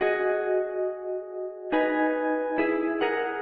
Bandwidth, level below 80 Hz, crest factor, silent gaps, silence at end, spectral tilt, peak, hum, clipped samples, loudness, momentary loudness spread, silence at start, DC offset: 4.7 kHz; -64 dBFS; 14 dB; none; 0 s; -2 dB/octave; -12 dBFS; none; under 0.1%; -27 LUFS; 9 LU; 0 s; under 0.1%